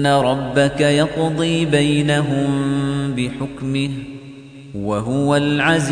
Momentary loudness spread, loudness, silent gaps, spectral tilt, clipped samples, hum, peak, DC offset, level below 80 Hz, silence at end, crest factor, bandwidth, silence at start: 13 LU; -18 LUFS; none; -6 dB/octave; under 0.1%; none; -4 dBFS; under 0.1%; -46 dBFS; 0 s; 14 dB; 10 kHz; 0 s